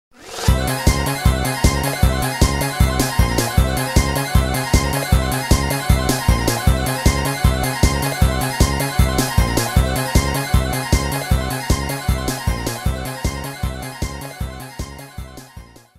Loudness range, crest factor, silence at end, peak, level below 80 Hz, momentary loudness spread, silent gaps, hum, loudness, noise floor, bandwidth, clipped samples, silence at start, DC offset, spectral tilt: 6 LU; 18 dB; 0.35 s; 0 dBFS; -22 dBFS; 10 LU; none; none; -19 LUFS; -41 dBFS; 16 kHz; under 0.1%; 0.2 s; under 0.1%; -4.5 dB/octave